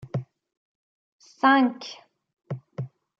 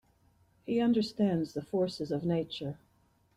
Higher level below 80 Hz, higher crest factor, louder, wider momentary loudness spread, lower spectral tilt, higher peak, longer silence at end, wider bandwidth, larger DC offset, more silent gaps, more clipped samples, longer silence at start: second, -72 dBFS vs -66 dBFS; first, 20 dB vs 14 dB; first, -23 LUFS vs -32 LUFS; first, 20 LU vs 13 LU; about the same, -6.5 dB/octave vs -7.5 dB/octave; first, -8 dBFS vs -18 dBFS; second, 0.3 s vs 0.6 s; second, 7 kHz vs 12 kHz; neither; first, 0.57-1.19 s vs none; neither; second, 0.05 s vs 0.65 s